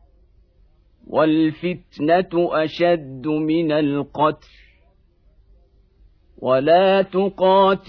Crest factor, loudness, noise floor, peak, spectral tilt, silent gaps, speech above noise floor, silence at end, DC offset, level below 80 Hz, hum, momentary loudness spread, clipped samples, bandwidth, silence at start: 16 dB; -19 LUFS; -56 dBFS; -4 dBFS; -8.5 dB/octave; none; 38 dB; 0.1 s; under 0.1%; -54 dBFS; none; 10 LU; under 0.1%; 5.4 kHz; 1.1 s